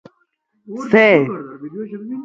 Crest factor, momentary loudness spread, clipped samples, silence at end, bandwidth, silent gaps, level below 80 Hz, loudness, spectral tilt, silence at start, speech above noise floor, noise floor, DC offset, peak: 18 dB; 20 LU; under 0.1%; 0 s; 7.6 kHz; none; -64 dBFS; -14 LUFS; -7 dB/octave; 0.7 s; 49 dB; -66 dBFS; under 0.1%; 0 dBFS